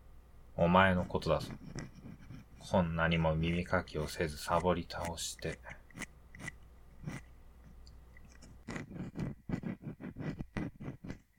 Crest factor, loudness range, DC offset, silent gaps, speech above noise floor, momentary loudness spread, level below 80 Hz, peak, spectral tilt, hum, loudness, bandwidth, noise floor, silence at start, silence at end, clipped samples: 26 dB; 15 LU; under 0.1%; none; 23 dB; 19 LU; -52 dBFS; -12 dBFS; -5.5 dB/octave; none; -35 LUFS; 17 kHz; -55 dBFS; 0 s; 0.2 s; under 0.1%